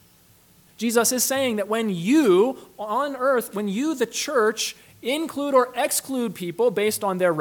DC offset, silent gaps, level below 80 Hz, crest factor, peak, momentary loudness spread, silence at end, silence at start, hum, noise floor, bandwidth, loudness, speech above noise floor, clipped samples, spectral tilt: under 0.1%; none; -70 dBFS; 18 dB; -6 dBFS; 9 LU; 0 s; 0.8 s; none; -56 dBFS; 19 kHz; -22 LUFS; 33 dB; under 0.1%; -3.5 dB/octave